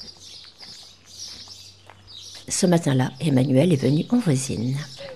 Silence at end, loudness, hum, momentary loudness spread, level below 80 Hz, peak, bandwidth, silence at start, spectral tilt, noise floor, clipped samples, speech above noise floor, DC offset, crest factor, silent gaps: 0 s; -21 LUFS; none; 22 LU; -60 dBFS; -6 dBFS; 13.5 kHz; 0 s; -6 dB/octave; -47 dBFS; under 0.1%; 27 dB; 0.2%; 18 dB; none